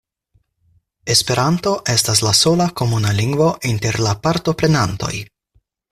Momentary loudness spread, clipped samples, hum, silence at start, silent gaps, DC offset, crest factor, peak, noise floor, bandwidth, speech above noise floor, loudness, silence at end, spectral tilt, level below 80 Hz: 7 LU; under 0.1%; none; 1.05 s; none; under 0.1%; 18 dB; 0 dBFS; -62 dBFS; 15.5 kHz; 45 dB; -16 LUFS; 0.7 s; -4 dB/octave; -44 dBFS